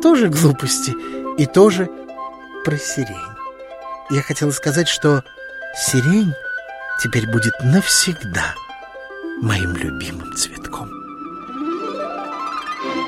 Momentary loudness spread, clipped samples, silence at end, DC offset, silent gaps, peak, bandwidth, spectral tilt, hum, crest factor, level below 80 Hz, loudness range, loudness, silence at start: 18 LU; under 0.1%; 0 s; under 0.1%; none; 0 dBFS; 16 kHz; -4.5 dB/octave; none; 20 dB; -46 dBFS; 7 LU; -18 LUFS; 0 s